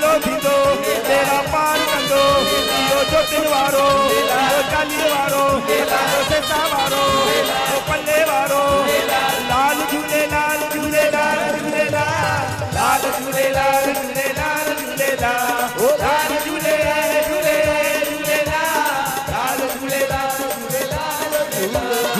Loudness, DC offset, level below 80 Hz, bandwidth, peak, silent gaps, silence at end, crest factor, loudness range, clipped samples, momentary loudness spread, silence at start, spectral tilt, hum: -17 LUFS; under 0.1%; -42 dBFS; 15 kHz; -6 dBFS; none; 0 s; 12 dB; 3 LU; under 0.1%; 5 LU; 0 s; -3 dB/octave; none